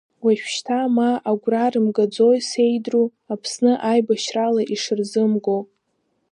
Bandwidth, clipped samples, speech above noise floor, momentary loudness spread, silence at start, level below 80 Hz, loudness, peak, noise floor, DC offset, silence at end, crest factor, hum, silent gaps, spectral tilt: 10.5 kHz; under 0.1%; 51 dB; 6 LU; 0.25 s; -76 dBFS; -20 LUFS; -6 dBFS; -70 dBFS; under 0.1%; 0.7 s; 14 dB; none; none; -5 dB/octave